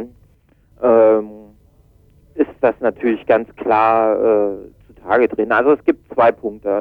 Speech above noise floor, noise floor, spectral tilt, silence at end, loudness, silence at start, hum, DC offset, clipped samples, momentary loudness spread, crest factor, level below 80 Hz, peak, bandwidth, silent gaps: 38 dB; -54 dBFS; -8.5 dB/octave; 0 s; -16 LUFS; 0 s; none; under 0.1%; under 0.1%; 12 LU; 16 dB; -52 dBFS; -2 dBFS; 4.8 kHz; none